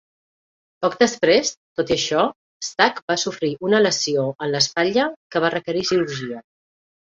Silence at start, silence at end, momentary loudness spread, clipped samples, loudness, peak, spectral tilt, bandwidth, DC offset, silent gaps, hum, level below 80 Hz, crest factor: 0.8 s; 0.8 s; 9 LU; under 0.1%; -20 LUFS; -2 dBFS; -3.5 dB/octave; 7.8 kHz; under 0.1%; 1.57-1.76 s, 2.36-2.60 s, 3.02-3.08 s, 5.16-5.30 s; none; -58 dBFS; 20 dB